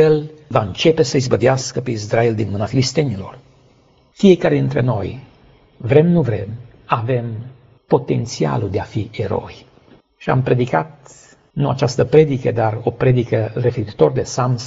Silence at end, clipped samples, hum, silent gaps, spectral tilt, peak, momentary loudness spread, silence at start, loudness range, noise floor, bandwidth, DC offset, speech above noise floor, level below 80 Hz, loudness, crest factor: 0 s; under 0.1%; none; none; -6.5 dB/octave; 0 dBFS; 15 LU; 0 s; 4 LU; -53 dBFS; 8 kHz; under 0.1%; 36 dB; -46 dBFS; -17 LUFS; 18 dB